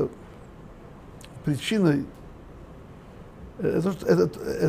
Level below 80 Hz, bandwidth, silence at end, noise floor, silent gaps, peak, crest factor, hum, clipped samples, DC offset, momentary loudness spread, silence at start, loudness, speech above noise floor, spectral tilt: -50 dBFS; 15.5 kHz; 0 s; -45 dBFS; none; -8 dBFS; 20 dB; none; under 0.1%; under 0.1%; 24 LU; 0 s; -25 LUFS; 21 dB; -6.5 dB/octave